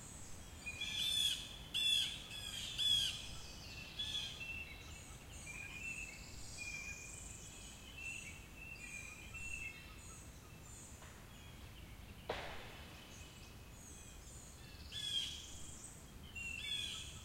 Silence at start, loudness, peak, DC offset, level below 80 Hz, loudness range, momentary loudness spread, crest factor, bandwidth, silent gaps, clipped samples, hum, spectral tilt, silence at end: 0 s; -42 LUFS; -24 dBFS; under 0.1%; -60 dBFS; 15 LU; 20 LU; 22 dB; 16 kHz; none; under 0.1%; none; -1 dB/octave; 0 s